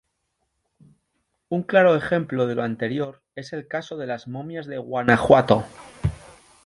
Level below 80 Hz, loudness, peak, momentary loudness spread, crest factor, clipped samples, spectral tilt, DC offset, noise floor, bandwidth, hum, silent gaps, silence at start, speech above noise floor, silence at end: -46 dBFS; -22 LUFS; 0 dBFS; 17 LU; 22 dB; under 0.1%; -7 dB/octave; under 0.1%; -75 dBFS; 11.5 kHz; none; none; 1.5 s; 53 dB; 0.5 s